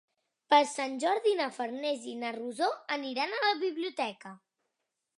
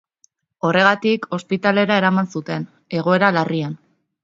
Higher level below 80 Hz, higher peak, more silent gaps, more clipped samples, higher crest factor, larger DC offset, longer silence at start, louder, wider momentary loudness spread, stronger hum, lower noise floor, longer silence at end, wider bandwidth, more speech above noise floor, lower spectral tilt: second, -90 dBFS vs -66 dBFS; second, -10 dBFS vs 0 dBFS; neither; neither; about the same, 22 dB vs 20 dB; neither; second, 0.5 s vs 0.65 s; second, -31 LUFS vs -18 LUFS; about the same, 11 LU vs 12 LU; neither; first, -85 dBFS vs -61 dBFS; first, 0.8 s vs 0.5 s; first, 11.5 kHz vs 7.6 kHz; first, 54 dB vs 43 dB; second, -2 dB/octave vs -6.5 dB/octave